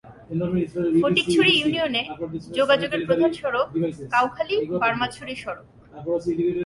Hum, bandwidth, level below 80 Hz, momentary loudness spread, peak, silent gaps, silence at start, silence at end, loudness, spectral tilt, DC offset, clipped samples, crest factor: none; 11.5 kHz; -54 dBFS; 14 LU; -4 dBFS; none; 0.05 s; 0 s; -22 LUFS; -5.5 dB/octave; under 0.1%; under 0.1%; 18 dB